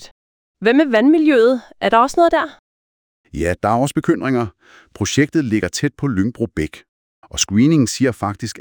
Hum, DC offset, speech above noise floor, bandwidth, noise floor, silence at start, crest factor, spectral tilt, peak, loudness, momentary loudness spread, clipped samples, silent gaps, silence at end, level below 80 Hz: none; under 0.1%; over 74 dB; 20 kHz; under -90 dBFS; 0 s; 16 dB; -5 dB/octave; -2 dBFS; -17 LUFS; 11 LU; under 0.1%; 0.11-0.54 s, 2.59-3.24 s, 6.89-7.22 s; 0 s; -44 dBFS